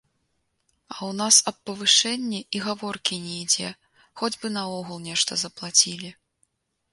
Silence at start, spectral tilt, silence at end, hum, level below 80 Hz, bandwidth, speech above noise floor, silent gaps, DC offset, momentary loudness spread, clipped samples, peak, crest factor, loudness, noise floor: 0.9 s; -1 dB/octave; 0.8 s; none; -70 dBFS; 12 kHz; 48 dB; none; under 0.1%; 16 LU; under 0.1%; -4 dBFS; 24 dB; -22 LUFS; -73 dBFS